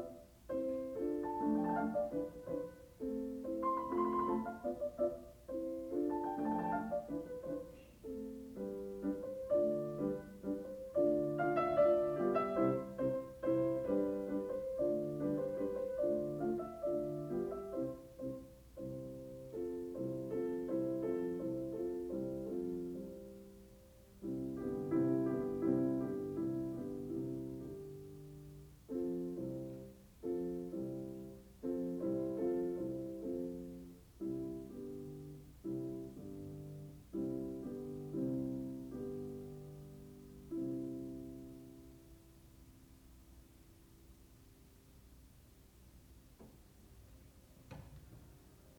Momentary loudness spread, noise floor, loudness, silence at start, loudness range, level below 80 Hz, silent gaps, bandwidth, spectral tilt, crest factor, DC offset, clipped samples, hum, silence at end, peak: 18 LU; -63 dBFS; -40 LUFS; 0 s; 11 LU; -64 dBFS; none; over 20 kHz; -8.5 dB/octave; 20 dB; under 0.1%; under 0.1%; none; 0 s; -22 dBFS